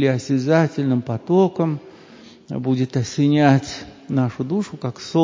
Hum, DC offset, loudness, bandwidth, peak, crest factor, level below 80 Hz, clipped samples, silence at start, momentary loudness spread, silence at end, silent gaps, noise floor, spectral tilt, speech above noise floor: none; under 0.1%; -20 LUFS; 7.6 kHz; 0 dBFS; 20 dB; -56 dBFS; under 0.1%; 0 s; 13 LU; 0 s; none; -44 dBFS; -7 dB/octave; 26 dB